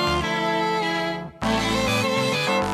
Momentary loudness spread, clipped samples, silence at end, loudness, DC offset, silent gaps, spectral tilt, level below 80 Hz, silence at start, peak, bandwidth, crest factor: 4 LU; under 0.1%; 0 s; -23 LUFS; under 0.1%; none; -4 dB/octave; -42 dBFS; 0 s; -8 dBFS; 15.5 kHz; 14 dB